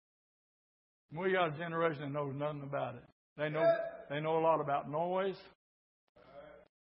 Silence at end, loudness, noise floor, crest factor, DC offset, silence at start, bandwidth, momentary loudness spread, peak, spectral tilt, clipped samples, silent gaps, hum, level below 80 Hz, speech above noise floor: 0.25 s; -35 LUFS; -56 dBFS; 18 dB; under 0.1%; 1.1 s; 5.4 kHz; 18 LU; -18 dBFS; -4.5 dB/octave; under 0.1%; 3.12-3.36 s, 5.55-6.15 s; none; -78 dBFS; 21 dB